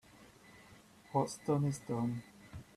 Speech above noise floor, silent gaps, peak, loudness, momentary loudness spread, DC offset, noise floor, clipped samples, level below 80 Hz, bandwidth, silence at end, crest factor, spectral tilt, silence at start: 25 dB; none; -20 dBFS; -37 LUFS; 24 LU; under 0.1%; -60 dBFS; under 0.1%; -66 dBFS; 13.5 kHz; 0.15 s; 20 dB; -7 dB/octave; 0.2 s